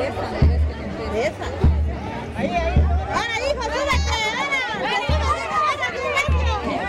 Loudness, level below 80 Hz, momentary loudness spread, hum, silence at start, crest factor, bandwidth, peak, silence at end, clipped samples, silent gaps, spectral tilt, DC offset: -22 LUFS; -26 dBFS; 6 LU; none; 0 s; 14 dB; 11 kHz; -6 dBFS; 0 s; under 0.1%; none; -5.5 dB/octave; under 0.1%